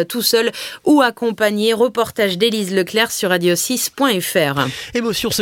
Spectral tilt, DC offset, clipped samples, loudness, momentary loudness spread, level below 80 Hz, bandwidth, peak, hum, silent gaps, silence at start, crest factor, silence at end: -3.5 dB/octave; under 0.1%; under 0.1%; -17 LUFS; 6 LU; -54 dBFS; 17 kHz; 0 dBFS; none; none; 0 s; 16 dB; 0 s